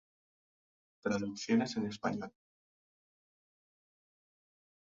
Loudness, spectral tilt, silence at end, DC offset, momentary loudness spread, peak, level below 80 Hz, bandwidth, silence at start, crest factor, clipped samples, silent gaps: -36 LUFS; -5 dB/octave; 2.55 s; under 0.1%; 10 LU; -18 dBFS; -76 dBFS; 7.4 kHz; 1.05 s; 22 dB; under 0.1%; none